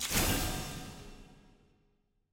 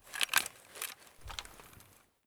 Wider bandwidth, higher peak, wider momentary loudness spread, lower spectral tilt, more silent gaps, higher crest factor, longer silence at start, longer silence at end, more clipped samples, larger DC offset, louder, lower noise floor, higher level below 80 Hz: second, 17 kHz vs over 20 kHz; second, -16 dBFS vs -10 dBFS; about the same, 22 LU vs 23 LU; first, -3 dB/octave vs 1 dB/octave; neither; second, 22 dB vs 30 dB; about the same, 0 s vs 0.05 s; first, 0.95 s vs 0.45 s; neither; neither; first, -33 LUFS vs -36 LUFS; first, -74 dBFS vs -61 dBFS; first, -44 dBFS vs -60 dBFS